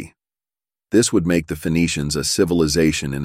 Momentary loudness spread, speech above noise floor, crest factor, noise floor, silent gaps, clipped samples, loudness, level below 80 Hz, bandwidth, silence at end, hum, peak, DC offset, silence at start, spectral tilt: 4 LU; over 72 dB; 16 dB; under -90 dBFS; none; under 0.1%; -18 LUFS; -40 dBFS; 16 kHz; 0 s; none; -4 dBFS; under 0.1%; 0 s; -4.5 dB/octave